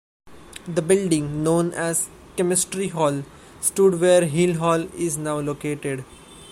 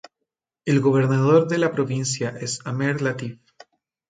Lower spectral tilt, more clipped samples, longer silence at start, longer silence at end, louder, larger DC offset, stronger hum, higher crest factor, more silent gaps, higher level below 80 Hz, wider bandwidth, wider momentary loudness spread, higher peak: about the same, -5 dB/octave vs -6 dB/octave; neither; second, 0.25 s vs 0.65 s; second, 0 s vs 0.75 s; about the same, -22 LUFS vs -21 LUFS; neither; neither; about the same, 18 dB vs 18 dB; neither; first, -52 dBFS vs -64 dBFS; first, 16 kHz vs 9.4 kHz; about the same, 13 LU vs 12 LU; about the same, -4 dBFS vs -4 dBFS